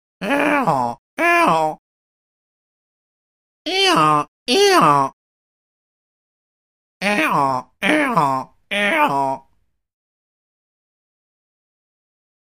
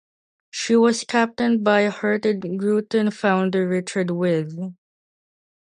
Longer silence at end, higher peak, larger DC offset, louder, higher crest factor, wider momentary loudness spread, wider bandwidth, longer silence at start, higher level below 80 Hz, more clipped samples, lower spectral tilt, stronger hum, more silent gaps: first, 3.05 s vs 0.9 s; first, 0 dBFS vs -4 dBFS; first, 0.2% vs under 0.1%; first, -17 LUFS vs -21 LUFS; about the same, 20 dB vs 18 dB; about the same, 11 LU vs 9 LU; first, 15.5 kHz vs 11 kHz; second, 0.2 s vs 0.55 s; first, -62 dBFS vs -68 dBFS; neither; second, -4 dB/octave vs -5.5 dB/octave; neither; first, 0.98-1.17 s, 1.79-3.65 s, 4.28-4.46 s, 5.13-7.00 s vs none